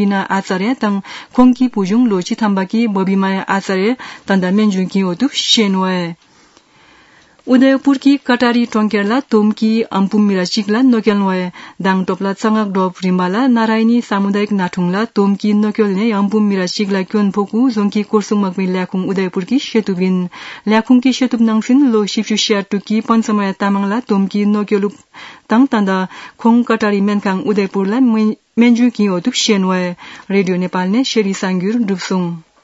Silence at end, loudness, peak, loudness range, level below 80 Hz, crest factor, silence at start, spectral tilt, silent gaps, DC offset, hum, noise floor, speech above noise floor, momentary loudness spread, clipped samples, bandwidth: 0.2 s; -14 LUFS; 0 dBFS; 2 LU; -56 dBFS; 14 dB; 0 s; -5.5 dB/octave; none; under 0.1%; none; -48 dBFS; 34 dB; 6 LU; under 0.1%; 8 kHz